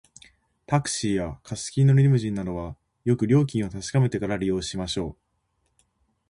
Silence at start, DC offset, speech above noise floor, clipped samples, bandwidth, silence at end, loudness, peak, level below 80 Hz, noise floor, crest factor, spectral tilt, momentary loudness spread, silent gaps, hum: 0.7 s; under 0.1%; 49 dB; under 0.1%; 11 kHz; 1.2 s; -24 LUFS; -8 dBFS; -48 dBFS; -73 dBFS; 16 dB; -6 dB/octave; 13 LU; none; none